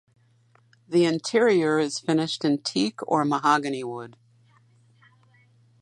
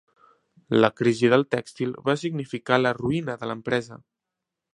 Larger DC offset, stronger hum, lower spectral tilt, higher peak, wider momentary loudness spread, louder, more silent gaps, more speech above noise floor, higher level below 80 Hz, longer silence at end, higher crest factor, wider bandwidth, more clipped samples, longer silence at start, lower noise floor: neither; neither; about the same, -5 dB/octave vs -6 dB/octave; second, -8 dBFS vs -2 dBFS; about the same, 11 LU vs 11 LU; about the same, -24 LUFS vs -24 LUFS; neither; second, 38 dB vs 62 dB; second, -74 dBFS vs -62 dBFS; first, 1.7 s vs 0.8 s; second, 18 dB vs 24 dB; about the same, 11.5 kHz vs 11 kHz; neither; first, 0.9 s vs 0.7 s; second, -61 dBFS vs -85 dBFS